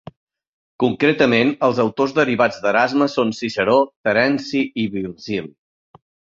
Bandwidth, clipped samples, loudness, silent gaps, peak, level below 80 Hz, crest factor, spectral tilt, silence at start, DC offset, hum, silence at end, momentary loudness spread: 7.6 kHz; under 0.1%; -18 LUFS; 3.96-4.04 s; -2 dBFS; -58 dBFS; 18 dB; -6 dB/octave; 0.8 s; under 0.1%; none; 0.8 s; 9 LU